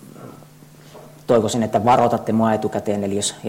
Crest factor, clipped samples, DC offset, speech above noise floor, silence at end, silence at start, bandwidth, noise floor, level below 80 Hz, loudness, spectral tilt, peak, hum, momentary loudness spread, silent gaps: 14 dB; under 0.1%; under 0.1%; 26 dB; 0 s; 0.05 s; 16.5 kHz; -45 dBFS; -56 dBFS; -19 LUFS; -5 dB/octave; -6 dBFS; none; 17 LU; none